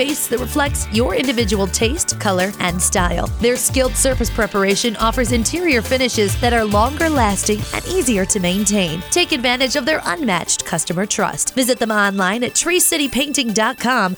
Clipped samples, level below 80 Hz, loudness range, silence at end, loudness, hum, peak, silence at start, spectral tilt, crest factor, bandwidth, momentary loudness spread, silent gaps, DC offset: under 0.1%; -30 dBFS; 1 LU; 0 s; -17 LUFS; none; -2 dBFS; 0 s; -3 dB/octave; 16 dB; over 20 kHz; 3 LU; none; under 0.1%